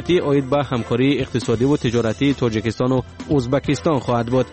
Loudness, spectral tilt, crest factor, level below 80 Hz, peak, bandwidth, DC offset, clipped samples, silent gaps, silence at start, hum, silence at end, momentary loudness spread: -19 LUFS; -6.5 dB/octave; 12 dB; -42 dBFS; -6 dBFS; 8.8 kHz; 0.2%; under 0.1%; none; 0 s; none; 0 s; 4 LU